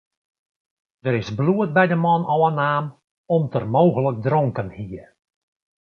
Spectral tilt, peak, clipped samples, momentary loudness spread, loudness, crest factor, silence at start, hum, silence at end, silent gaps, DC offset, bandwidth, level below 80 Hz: -8.5 dB/octave; -2 dBFS; under 0.1%; 14 LU; -20 LUFS; 20 dB; 1.05 s; none; 0.8 s; 3.11-3.24 s; under 0.1%; 6.6 kHz; -56 dBFS